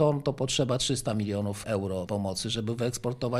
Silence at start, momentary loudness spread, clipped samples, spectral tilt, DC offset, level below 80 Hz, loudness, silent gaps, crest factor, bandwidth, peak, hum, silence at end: 0 s; 5 LU; under 0.1%; -5 dB/octave; under 0.1%; -54 dBFS; -29 LUFS; none; 18 dB; 14.5 kHz; -10 dBFS; none; 0 s